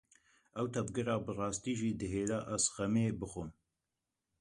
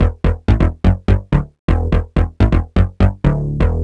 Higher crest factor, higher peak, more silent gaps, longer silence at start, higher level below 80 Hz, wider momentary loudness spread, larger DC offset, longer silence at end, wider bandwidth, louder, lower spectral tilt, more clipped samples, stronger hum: first, 20 dB vs 14 dB; second, -16 dBFS vs -2 dBFS; second, none vs 1.59-1.68 s; first, 0.55 s vs 0 s; second, -60 dBFS vs -18 dBFS; first, 10 LU vs 4 LU; neither; first, 0.9 s vs 0 s; first, 11.5 kHz vs 5.8 kHz; second, -36 LUFS vs -17 LUFS; second, -5 dB/octave vs -9 dB/octave; neither; neither